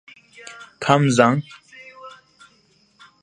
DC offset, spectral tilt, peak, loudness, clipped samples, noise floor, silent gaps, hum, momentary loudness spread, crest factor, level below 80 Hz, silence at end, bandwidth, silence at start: under 0.1%; -5.5 dB/octave; 0 dBFS; -18 LUFS; under 0.1%; -59 dBFS; none; none; 26 LU; 22 dB; -66 dBFS; 1.15 s; 11.5 kHz; 0.45 s